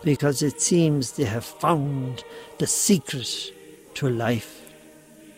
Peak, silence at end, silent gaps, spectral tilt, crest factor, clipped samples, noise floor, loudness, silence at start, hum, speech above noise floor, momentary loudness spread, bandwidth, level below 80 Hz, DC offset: -6 dBFS; 0.05 s; none; -4.5 dB/octave; 18 dB; under 0.1%; -49 dBFS; -24 LUFS; 0 s; none; 25 dB; 15 LU; 16 kHz; -60 dBFS; under 0.1%